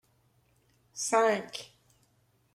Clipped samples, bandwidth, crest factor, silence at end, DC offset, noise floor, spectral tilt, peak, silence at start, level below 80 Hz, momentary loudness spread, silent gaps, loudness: under 0.1%; 15 kHz; 20 dB; 0.9 s; under 0.1%; -70 dBFS; -2 dB/octave; -14 dBFS; 0.95 s; -78 dBFS; 21 LU; none; -29 LUFS